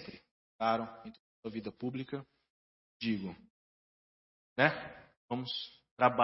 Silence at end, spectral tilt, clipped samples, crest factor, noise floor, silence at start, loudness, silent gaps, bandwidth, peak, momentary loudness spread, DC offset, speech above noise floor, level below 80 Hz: 0 s; -3 dB/octave; under 0.1%; 28 dB; under -90 dBFS; 0 s; -36 LUFS; 0.31-0.59 s, 1.20-1.43 s, 2.50-3.00 s, 3.50-4.56 s, 5.17-5.28 s, 5.91-5.97 s; 5.8 kHz; -10 dBFS; 20 LU; under 0.1%; over 56 dB; -74 dBFS